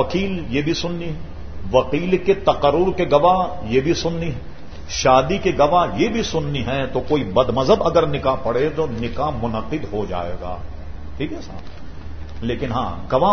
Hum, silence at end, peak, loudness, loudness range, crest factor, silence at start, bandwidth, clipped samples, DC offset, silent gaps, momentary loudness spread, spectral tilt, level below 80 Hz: none; 0 s; 0 dBFS; -20 LUFS; 9 LU; 20 dB; 0 s; 6.6 kHz; under 0.1%; 3%; none; 19 LU; -6 dB/octave; -36 dBFS